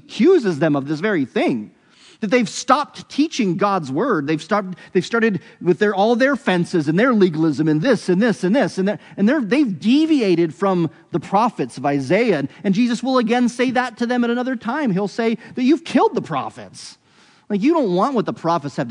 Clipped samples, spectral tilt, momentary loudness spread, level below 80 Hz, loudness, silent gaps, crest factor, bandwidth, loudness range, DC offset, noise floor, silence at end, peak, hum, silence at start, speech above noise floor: under 0.1%; -6 dB/octave; 7 LU; -70 dBFS; -19 LUFS; none; 18 dB; 10.5 kHz; 3 LU; under 0.1%; -53 dBFS; 0 s; 0 dBFS; none; 0.1 s; 35 dB